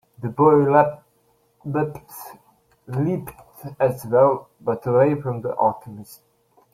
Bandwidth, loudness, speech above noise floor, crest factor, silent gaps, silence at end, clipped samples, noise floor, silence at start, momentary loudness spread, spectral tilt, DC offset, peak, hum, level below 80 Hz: 16.5 kHz; -21 LUFS; 43 dB; 20 dB; none; 0.6 s; under 0.1%; -63 dBFS; 0.2 s; 23 LU; -8.5 dB/octave; under 0.1%; -2 dBFS; none; -60 dBFS